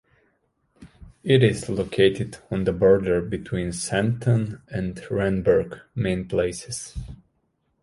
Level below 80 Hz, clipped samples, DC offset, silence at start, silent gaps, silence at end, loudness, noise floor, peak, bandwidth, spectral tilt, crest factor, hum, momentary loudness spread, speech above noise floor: -44 dBFS; under 0.1%; under 0.1%; 0.8 s; none; 0.65 s; -23 LUFS; -71 dBFS; -4 dBFS; 11.5 kHz; -6 dB/octave; 20 dB; none; 14 LU; 48 dB